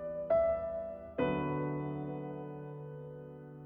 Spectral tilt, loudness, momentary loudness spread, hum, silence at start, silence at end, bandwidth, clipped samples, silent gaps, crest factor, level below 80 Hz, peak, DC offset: -10.5 dB/octave; -36 LUFS; 16 LU; none; 0 s; 0 s; 3.8 kHz; under 0.1%; none; 16 dB; -60 dBFS; -20 dBFS; under 0.1%